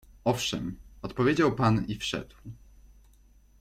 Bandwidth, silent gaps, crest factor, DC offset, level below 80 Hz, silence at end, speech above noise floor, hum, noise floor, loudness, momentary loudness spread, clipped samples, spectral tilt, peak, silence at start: 15.5 kHz; none; 22 dB; under 0.1%; -50 dBFS; 1.05 s; 31 dB; none; -58 dBFS; -28 LUFS; 20 LU; under 0.1%; -5.5 dB/octave; -8 dBFS; 0.25 s